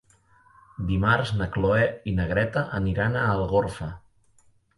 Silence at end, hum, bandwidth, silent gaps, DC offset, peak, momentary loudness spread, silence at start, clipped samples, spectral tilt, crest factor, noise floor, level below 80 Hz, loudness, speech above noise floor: 0.8 s; none; 11.5 kHz; none; under 0.1%; -6 dBFS; 11 LU; 0.8 s; under 0.1%; -7.5 dB/octave; 20 dB; -60 dBFS; -40 dBFS; -25 LUFS; 36 dB